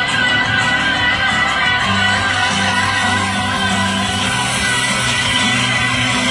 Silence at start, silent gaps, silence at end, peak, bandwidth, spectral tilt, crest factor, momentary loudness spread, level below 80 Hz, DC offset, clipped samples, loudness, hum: 0 s; none; 0 s; -4 dBFS; 11.5 kHz; -2.5 dB/octave; 12 dB; 2 LU; -38 dBFS; under 0.1%; under 0.1%; -14 LUFS; none